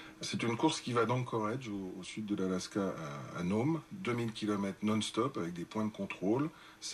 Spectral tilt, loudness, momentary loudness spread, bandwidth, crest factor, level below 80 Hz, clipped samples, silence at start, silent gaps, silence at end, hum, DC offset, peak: -5.5 dB/octave; -36 LUFS; 9 LU; 13 kHz; 18 dB; -70 dBFS; under 0.1%; 0 s; none; 0 s; none; under 0.1%; -18 dBFS